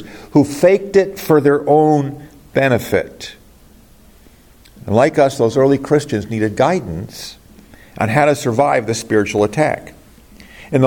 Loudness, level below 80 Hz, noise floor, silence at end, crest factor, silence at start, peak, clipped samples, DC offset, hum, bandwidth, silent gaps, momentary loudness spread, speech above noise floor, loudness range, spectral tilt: -15 LUFS; -48 dBFS; -45 dBFS; 0 s; 16 dB; 0 s; 0 dBFS; under 0.1%; under 0.1%; none; 17.5 kHz; none; 15 LU; 31 dB; 4 LU; -6 dB/octave